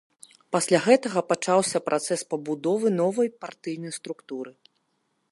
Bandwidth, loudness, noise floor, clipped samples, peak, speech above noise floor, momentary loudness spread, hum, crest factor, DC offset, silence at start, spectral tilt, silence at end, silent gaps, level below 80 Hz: 12 kHz; -25 LUFS; -73 dBFS; under 0.1%; -4 dBFS; 49 dB; 15 LU; none; 22 dB; under 0.1%; 0.5 s; -4.5 dB/octave; 0.8 s; none; -76 dBFS